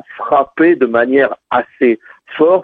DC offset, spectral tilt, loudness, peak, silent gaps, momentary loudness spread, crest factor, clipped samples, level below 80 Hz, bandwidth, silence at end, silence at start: under 0.1%; -8.5 dB/octave; -13 LUFS; 0 dBFS; none; 7 LU; 14 dB; under 0.1%; -58 dBFS; 4.3 kHz; 0 s; 0.1 s